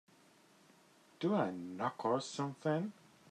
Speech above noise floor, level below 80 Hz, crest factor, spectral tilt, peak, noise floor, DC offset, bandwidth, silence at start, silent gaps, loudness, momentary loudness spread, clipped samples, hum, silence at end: 29 dB; -86 dBFS; 18 dB; -6 dB/octave; -22 dBFS; -66 dBFS; under 0.1%; 13 kHz; 1.2 s; none; -38 LUFS; 6 LU; under 0.1%; none; 0.4 s